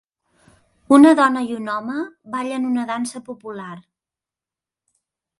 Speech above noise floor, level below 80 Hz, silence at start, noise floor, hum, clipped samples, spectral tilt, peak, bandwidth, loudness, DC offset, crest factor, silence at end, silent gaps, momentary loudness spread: 71 dB; -66 dBFS; 0.9 s; -89 dBFS; none; under 0.1%; -4.5 dB/octave; 0 dBFS; 11.5 kHz; -18 LUFS; under 0.1%; 20 dB; 1.6 s; none; 21 LU